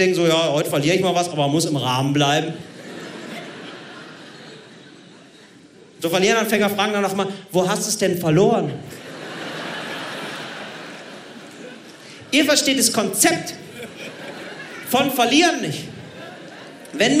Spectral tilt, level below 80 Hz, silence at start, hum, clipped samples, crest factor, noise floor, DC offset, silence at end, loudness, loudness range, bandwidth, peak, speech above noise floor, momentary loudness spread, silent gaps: -3.5 dB/octave; -66 dBFS; 0 s; none; under 0.1%; 20 dB; -47 dBFS; under 0.1%; 0 s; -19 LUFS; 12 LU; 16 kHz; -2 dBFS; 28 dB; 21 LU; none